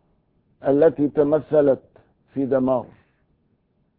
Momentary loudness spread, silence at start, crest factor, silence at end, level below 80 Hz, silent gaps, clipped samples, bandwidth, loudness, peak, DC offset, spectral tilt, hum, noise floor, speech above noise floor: 10 LU; 0.65 s; 16 dB; 1.15 s; -58 dBFS; none; under 0.1%; 4.2 kHz; -20 LUFS; -6 dBFS; under 0.1%; -12.5 dB/octave; none; -66 dBFS; 47 dB